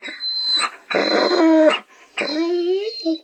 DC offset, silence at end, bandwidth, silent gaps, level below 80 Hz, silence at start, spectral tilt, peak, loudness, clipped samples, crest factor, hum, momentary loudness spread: under 0.1%; 0.05 s; 8.8 kHz; none; -80 dBFS; 0 s; -3 dB/octave; -4 dBFS; -18 LUFS; under 0.1%; 16 dB; none; 10 LU